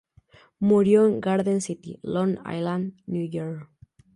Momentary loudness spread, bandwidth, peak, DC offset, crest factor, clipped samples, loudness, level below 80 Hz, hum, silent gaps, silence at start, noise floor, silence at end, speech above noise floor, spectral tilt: 15 LU; 11.5 kHz; -8 dBFS; under 0.1%; 16 dB; under 0.1%; -24 LUFS; -62 dBFS; none; none; 0.6 s; -56 dBFS; 0.5 s; 33 dB; -7 dB/octave